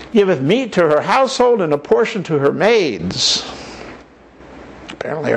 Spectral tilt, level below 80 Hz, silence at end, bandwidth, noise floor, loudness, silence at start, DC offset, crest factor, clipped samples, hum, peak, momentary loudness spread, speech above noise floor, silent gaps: -4.5 dB/octave; -50 dBFS; 0 s; 9.8 kHz; -42 dBFS; -15 LUFS; 0 s; under 0.1%; 14 dB; under 0.1%; none; -2 dBFS; 19 LU; 27 dB; none